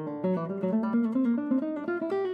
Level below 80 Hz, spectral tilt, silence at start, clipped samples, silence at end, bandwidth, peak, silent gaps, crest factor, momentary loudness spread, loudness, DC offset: -86 dBFS; -10 dB/octave; 0 s; under 0.1%; 0 s; 5 kHz; -18 dBFS; none; 10 dB; 4 LU; -29 LUFS; under 0.1%